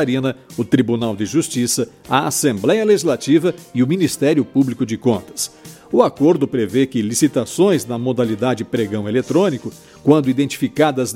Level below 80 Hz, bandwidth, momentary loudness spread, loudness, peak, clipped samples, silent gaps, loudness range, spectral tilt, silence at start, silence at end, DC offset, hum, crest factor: -58 dBFS; 16.5 kHz; 6 LU; -17 LUFS; 0 dBFS; under 0.1%; none; 1 LU; -5 dB/octave; 0 s; 0 s; under 0.1%; none; 18 dB